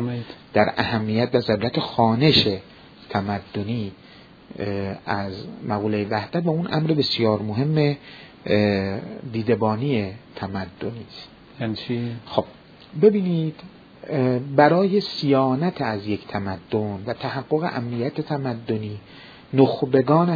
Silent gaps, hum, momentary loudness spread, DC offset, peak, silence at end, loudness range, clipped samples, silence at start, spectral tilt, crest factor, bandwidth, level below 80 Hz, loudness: none; none; 15 LU; under 0.1%; -2 dBFS; 0 s; 6 LU; under 0.1%; 0 s; -8 dB/octave; 22 dB; 5 kHz; -56 dBFS; -23 LUFS